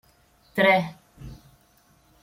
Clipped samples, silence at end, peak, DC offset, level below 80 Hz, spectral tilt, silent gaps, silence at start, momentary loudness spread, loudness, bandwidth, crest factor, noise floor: under 0.1%; 0.9 s; -8 dBFS; under 0.1%; -56 dBFS; -6 dB/octave; none; 0.55 s; 25 LU; -22 LUFS; 16.5 kHz; 20 dB; -60 dBFS